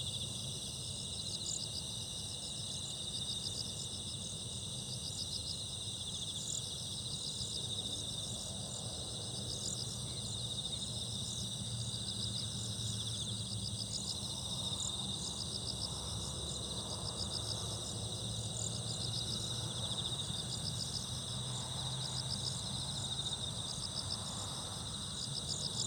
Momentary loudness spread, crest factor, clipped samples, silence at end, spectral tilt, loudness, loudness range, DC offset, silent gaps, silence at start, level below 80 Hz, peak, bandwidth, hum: 3 LU; 16 dB; under 0.1%; 0 s; -2.5 dB/octave; -39 LUFS; 1 LU; under 0.1%; none; 0 s; -58 dBFS; -24 dBFS; over 20 kHz; none